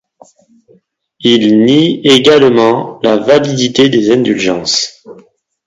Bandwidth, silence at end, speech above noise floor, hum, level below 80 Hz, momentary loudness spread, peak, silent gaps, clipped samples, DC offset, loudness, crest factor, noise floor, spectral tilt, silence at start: 11 kHz; 0.55 s; 35 dB; none; -50 dBFS; 6 LU; 0 dBFS; none; 0.4%; under 0.1%; -9 LUFS; 10 dB; -44 dBFS; -4.5 dB/octave; 1.2 s